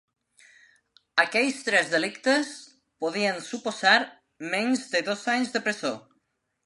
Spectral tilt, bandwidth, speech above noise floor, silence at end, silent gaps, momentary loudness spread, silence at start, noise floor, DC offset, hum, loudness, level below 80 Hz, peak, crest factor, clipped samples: -2.5 dB/octave; 11.5 kHz; 49 dB; 0.65 s; none; 12 LU; 1.15 s; -75 dBFS; under 0.1%; none; -25 LUFS; -80 dBFS; -6 dBFS; 22 dB; under 0.1%